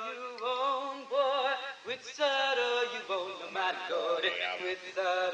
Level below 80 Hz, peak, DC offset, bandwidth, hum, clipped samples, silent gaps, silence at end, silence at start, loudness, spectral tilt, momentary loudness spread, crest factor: -84 dBFS; -18 dBFS; under 0.1%; 9.4 kHz; none; under 0.1%; none; 0 s; 0 s; -32 LUFS; -1.5 dB/octave; 8 LU; 16 dB